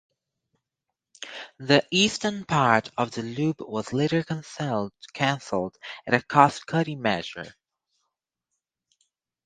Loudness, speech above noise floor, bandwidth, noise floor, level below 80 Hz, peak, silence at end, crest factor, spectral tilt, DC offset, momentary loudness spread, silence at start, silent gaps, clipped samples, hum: -25 LUFS; 60 dB; 9.6 kHz; -85 dBFS; -64 dBFS; 0 dBFS; 1.95 s; 26 dB; -4.5 dB/octave; under 0.1%; 17 LU; 1.2 s; none; under 0.1%; none